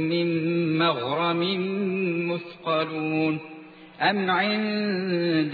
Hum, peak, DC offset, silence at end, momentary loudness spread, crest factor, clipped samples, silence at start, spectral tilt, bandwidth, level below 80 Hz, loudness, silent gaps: none; -10 dBFS; under 0.1%; 0 s; 5 LU; 16 dB; under 0.1%; 0 s; -9 dB/octave; 4.9 kHz; -74 dBFS; -25 LUFS; none